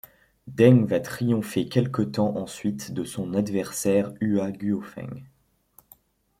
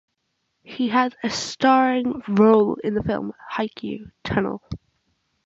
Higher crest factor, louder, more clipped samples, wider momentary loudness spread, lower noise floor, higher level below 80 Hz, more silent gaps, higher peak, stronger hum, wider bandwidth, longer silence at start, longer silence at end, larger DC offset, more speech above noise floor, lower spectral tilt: about the same, 22 dB vs 18 dB; second, -24 LUFS vs -21 LUFS; neither; second, 14 LU vs 17 LU; second, -60 dBFS vs -74 dBFS; second, -62 dBFS vs -50 dBFS; neither; about the same, -4 dBFS vs -4 dBFS; neither; first, 16 kHz vs 8 kHz; second, 0.45 s vs 0.7 s; first, 1.15 s vs 0.7 s; neither; second, 36 dB vs 53 dB; about the same, -6.5 dB/octave vs -5.5 dB/octave